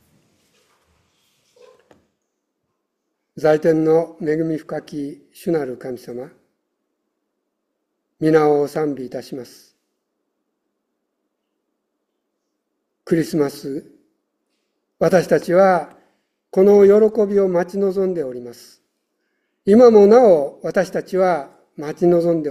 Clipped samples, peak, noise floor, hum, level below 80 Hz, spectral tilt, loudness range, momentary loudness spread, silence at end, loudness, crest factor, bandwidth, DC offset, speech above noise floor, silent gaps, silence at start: under 0.1%; 0 dBFS; -75 dBFS; none; -62 dBFS; -7.5 dB/octave; 12 LU; 20 LU; 0 s; -16 LUFS; 18 dB; 14 kHz; under 0.1%; 59 dB; none; 3.35 s